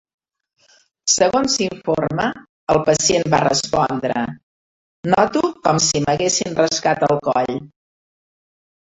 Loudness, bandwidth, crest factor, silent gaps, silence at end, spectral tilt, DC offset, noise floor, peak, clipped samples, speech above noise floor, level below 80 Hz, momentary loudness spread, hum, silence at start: -18 LUFS; 8.4 kHz; 18 dB; 2.49-2.67 s, 4.43-5.03 s; 1.15 s; -3.5 dB/octave; under 0.1%; -56 dBFS; -2 dBFS; under 0.1%; 39 dB; -50 dBFS; 9 LU; none; 1.05 s